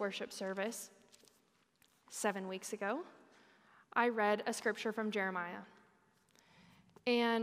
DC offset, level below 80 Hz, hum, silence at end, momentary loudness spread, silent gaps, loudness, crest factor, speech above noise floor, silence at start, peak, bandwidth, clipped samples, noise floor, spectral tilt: under 0.1%; under -90 dBFS; none; 0 s; 14 LU; none; -38 LUFS; 22 dB; 37 dB; 0 s; -16 dBFS; 15.5 kHz; under 0.1%; -74 dBFS; -3.5 dB/octave